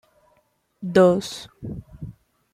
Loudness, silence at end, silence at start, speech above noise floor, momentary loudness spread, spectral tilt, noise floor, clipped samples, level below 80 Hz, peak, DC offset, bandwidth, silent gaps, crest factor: -19 LUFS; 0.45 s; 0.8 s; 45 dB; 23 LU; -6 dB/octave; -66 dBFS; under 0.1%; -52 dBFS; -4 dBFS; under 0.1%; 14.5 kHz; none; 20 dB